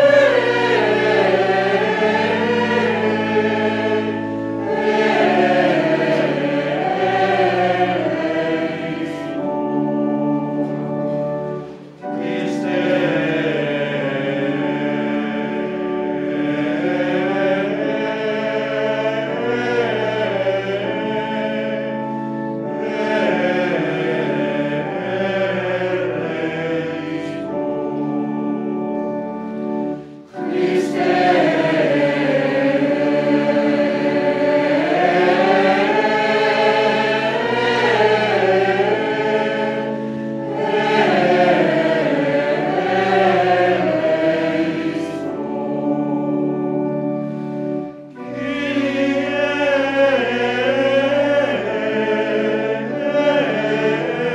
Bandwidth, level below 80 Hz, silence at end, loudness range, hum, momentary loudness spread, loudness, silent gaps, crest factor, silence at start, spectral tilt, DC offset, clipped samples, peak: 10.5 kHz; -58 dBFS; 0 s; 6 LU; none; 9 LU; -18 LUFS; none; 16 dB; 0 s; -6.5 dB/octave; under 0.1%; under 0.1%; -2 dBFS